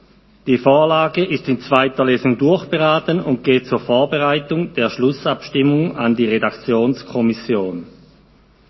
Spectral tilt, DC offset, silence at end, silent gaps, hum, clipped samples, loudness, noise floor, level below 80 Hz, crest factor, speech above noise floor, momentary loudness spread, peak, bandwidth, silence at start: -7.5 dB/octave; under 0.1%; 0.8 s; none; none; under 0.1%; -17 LUFS; -51 dBFS; -54 dBFS; 16 dB; 34 dB; 6 LU; 0 dBFS; 6 kHz; 0.45 s